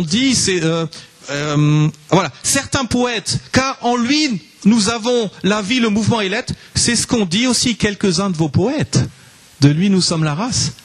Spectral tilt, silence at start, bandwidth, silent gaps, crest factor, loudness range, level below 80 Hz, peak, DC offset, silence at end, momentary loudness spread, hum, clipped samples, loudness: -4 dB/octave; 0 s; 13 kHz; none; 16 dB; 1 LU; -44 dBFS; 0 dBFS; under 0.1%; 0.1 s; 6 LU; none; under 0.1%; -16 LUFS